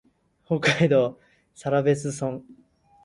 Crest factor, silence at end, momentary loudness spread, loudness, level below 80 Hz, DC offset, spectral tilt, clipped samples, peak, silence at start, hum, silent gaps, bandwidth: 18 dB; 0.5 s; 12 LU; -24 LUFS; -60 dBFS; under 0.1%; -5.5 dB/octave; under 0.1%; -6 dBFS; 0.5 s; none; none; 11.5 kHz